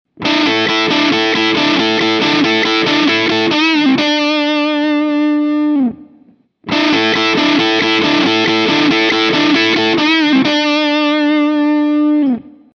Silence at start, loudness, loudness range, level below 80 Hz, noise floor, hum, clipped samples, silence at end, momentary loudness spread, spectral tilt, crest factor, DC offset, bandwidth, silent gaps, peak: 0.2 s; -12 LUFS; 3 LU; -56 dBFS; -48 dBFS; none; under 0.1%; 0.25 s; 3 LU; -4 dB/octave; 12 dB; under 0.1%; 7.2 kHz; none; -2 dBFS